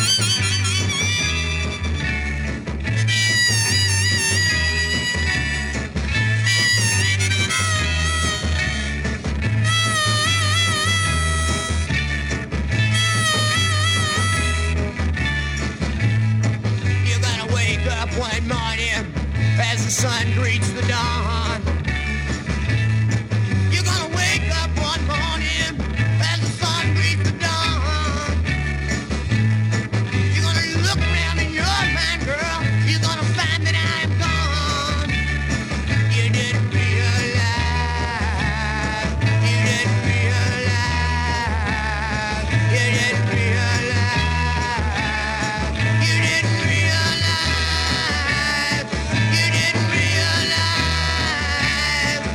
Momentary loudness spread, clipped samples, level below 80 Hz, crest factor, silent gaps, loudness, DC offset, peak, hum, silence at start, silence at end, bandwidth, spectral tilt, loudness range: 6 LU; under 0.1%; -30 dBFS; 14 dB; none; -19 LUFS; under 0.1%; -4 dBFS; none; 0 s; 0 s; 16.5 kHz; -3.5 dB/octave; 2 LU